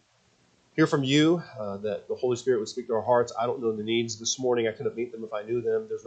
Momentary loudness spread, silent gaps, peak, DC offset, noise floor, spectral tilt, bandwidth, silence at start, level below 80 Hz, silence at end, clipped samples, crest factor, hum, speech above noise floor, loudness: 11 LU; none; -10 dBFS; under 0.1%; -65 dBFS; -4.5 dB/octave; 9 kHz; 0.75 s; -70 dBFS; 0.05 s; under 0.1%; 18 dB; none; 38 dB; -27 LUFS